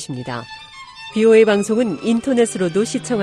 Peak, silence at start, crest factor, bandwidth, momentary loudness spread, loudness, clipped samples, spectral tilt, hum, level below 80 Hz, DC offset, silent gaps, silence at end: -2 dBFS; 0 s; 16 dB; 13 kHz; 22 LU; -17 LUFS; under 0.1%; -5 dB/octave; none; -56 dBFS; under 0.1%; none; 0 s